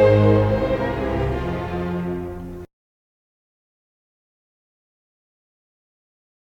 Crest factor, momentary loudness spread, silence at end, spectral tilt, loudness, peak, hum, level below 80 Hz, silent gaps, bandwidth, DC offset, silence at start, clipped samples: 20 dB; 17 LU; 3.8 s; -9 dB/octave; -21 LUFS; -4 dBFS; none; -38 dBFS; none; 6.8 kHz; under 0.1%; 0 s; under 0.1%